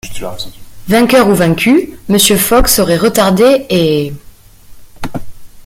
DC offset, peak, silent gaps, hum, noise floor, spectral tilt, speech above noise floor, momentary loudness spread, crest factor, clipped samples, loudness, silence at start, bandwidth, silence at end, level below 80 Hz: under 0.1%; 0 dBFS; none; none; -35 dBFS; -4 dB/octave; 25 dB; 17 LU; 12 dB; under 0.1%; -10 LUFS; 0.05 s; 17 kHz; 0.05 s; -28 dBFS